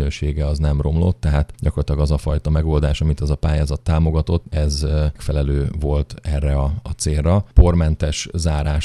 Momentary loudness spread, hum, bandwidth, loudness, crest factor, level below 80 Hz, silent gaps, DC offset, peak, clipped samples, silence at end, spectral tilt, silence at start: 6 LU; none; 11.5 kHz; -19 LUFS; 18 dB; -20 dBFS; none; under 0.1%; 0 dBFS; under 0.1%; 0 s; -6.5 dB/octave; 0 s